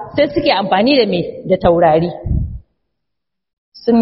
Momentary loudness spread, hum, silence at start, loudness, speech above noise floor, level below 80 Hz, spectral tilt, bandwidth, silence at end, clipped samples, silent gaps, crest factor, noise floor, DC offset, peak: 10 LU; none; 0 s; -14 LUFS; 67 dB; -30 dBFS; -4.5 dB/octave; 5.8 kHz; 0 s; under 0.1%; 3.53-3.72 s; 16 dB; -80 dBFS; under 0.1%; 0 dBFS